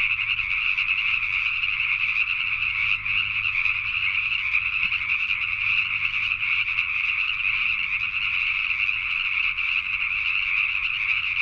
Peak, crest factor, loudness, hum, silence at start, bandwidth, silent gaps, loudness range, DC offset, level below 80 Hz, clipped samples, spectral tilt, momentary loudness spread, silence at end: -8 dBFS; 16 dB; -22 LUFS; none; 0 s; 7.6 kHz; none; 0 LU; under 0.1%; -50 dBFS; under 0.1%; -1 dB/octave; 2 LU; 0 s